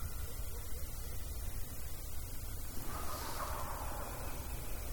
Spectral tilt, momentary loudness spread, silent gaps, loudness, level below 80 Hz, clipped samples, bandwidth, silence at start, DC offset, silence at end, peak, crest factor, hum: -4 dB/octave; 4 LU; none; -44 LUFS; -44 dBFS; under 0.1%; 19 kHz; 0 s; under 0.1%; 0 s; -26 dBFS; 14 dB; none